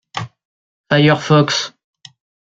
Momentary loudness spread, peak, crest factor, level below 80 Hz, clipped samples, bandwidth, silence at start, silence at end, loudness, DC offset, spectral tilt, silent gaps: 16 LU; -2 dBFS; 16 dB; -56 dBFS; under 0.1%; 7.8 kHz; 0.15 s; 0.75 s; -14 LUFS; under 0.1%; -5.5 dB/octave; 0.45-0.84 s